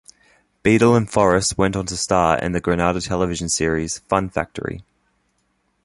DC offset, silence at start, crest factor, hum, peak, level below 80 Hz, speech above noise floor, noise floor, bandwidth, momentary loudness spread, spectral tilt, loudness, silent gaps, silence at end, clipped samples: under 0.1%; 0.65 s; 20 dB; none; -2 dBFS; -40 dBFS; 48 dB; -67 dBFS; 11.5 kHz; 10 LU; -4.5 dB/octave; -19 LUFS; none; 1.05 s; under 0.1%